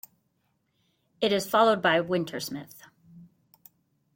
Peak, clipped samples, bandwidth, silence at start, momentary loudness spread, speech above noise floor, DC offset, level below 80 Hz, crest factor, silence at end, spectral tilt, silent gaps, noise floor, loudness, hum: -8 dBFS; under 0.1%; 16.5 kHz; 1.2 s; 14 LU; 49 dB; under 0.1%; -72 dBFS; 22 dB; 0.9 s; -4.5 dB/octave; none; -74 dBFS; -25 LUFS; none